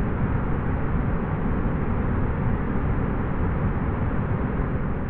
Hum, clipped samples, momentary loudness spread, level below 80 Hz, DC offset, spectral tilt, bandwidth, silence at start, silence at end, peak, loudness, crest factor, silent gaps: none; under 0.1%; 1 LU; -28 dBFS; under 0.1%; -9 dB/octave; 4 kHz; 0 s; 0 s; -12 dBFS; -26 LUFS; 12 dB; none